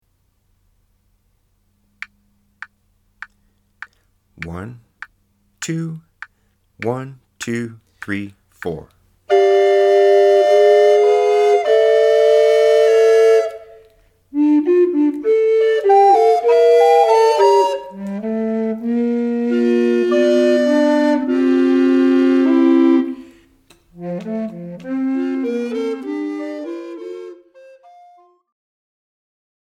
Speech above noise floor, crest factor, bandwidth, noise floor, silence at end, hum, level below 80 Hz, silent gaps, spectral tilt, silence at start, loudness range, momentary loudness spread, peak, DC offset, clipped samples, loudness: 38 dB; 14 dB; 12.5 kHz; -63 dBFS; 2.4 s; none; -60 dBFS; none; -6 dB/octave; 4.4 s; 17 LU; 19 LU; -2 dBFS; under 0.1%; under 0.1%; -15 LUFS